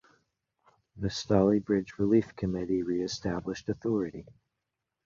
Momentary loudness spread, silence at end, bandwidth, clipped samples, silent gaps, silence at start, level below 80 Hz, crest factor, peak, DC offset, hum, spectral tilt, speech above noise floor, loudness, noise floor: 10 LU; 0.85 s; 7.6 kHz; under 0.1%; none; 0.95 s; -54 dBFS; 20 dB; -10 dBFS; under 0.1%; none; -6.5 dB/octave; 57 dB; -30 LUFS; -86 dBFS